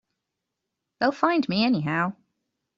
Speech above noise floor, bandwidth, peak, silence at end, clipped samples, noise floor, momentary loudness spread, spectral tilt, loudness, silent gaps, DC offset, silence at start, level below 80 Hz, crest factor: 60 dB; 7.6 kHz; -6 dBFS; 0.65 s; under 0.1%; -83 dBFS; 5 LU; -4 dB/octave; -24 LUFS; none; under 0.1%; 1 s; -68 dBFS; 20 dB